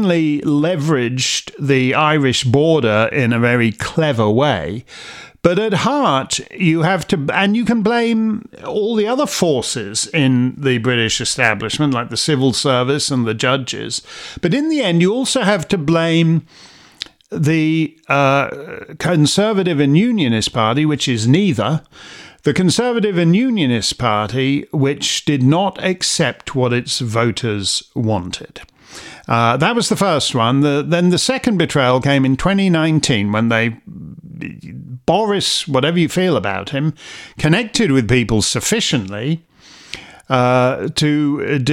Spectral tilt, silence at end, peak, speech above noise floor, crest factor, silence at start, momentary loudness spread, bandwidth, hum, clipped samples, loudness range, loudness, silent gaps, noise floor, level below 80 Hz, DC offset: -5 dB/octave; 0 s; 0 dBFS; 20 dB; 16 dB; 0 s; 10 LU; 15.5 kHz; none; under 0.1%; 3 LU; -16 LUFS; none; -36 dBFS; -46 dBFS; under 0.1%